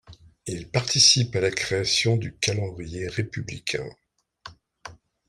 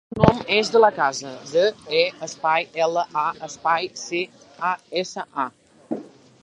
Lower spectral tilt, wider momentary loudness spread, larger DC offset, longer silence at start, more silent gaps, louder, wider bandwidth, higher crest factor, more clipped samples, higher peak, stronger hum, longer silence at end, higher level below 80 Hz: second, -3 dB/octave vs -4.5 dB/octave; first, 18 LU vs 13 LU; neither; about the same, 0.1 s vs 0.1 s; neither; about the same, -23 LUFS vs -22 LUFS; first, 15 kHz vs 10.5 kHz; about the same, 22 dB vs 22 dB; neither; second, -4 dBFS vs 0 dBFS; neither; about the same, 0.35 s vs 0.35 s; second, -54 dBFS vs -48 dBFS